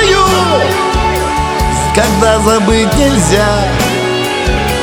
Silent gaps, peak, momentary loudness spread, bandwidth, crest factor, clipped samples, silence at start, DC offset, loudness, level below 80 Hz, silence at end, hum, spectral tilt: none; 0 dBFS; 4 LU; over 20 kHz; 10 dB; 0.3%; 0 s; under 0.1%; -11 LUFS; -20 dBFS; 0 s; none; -4.5 dB/octave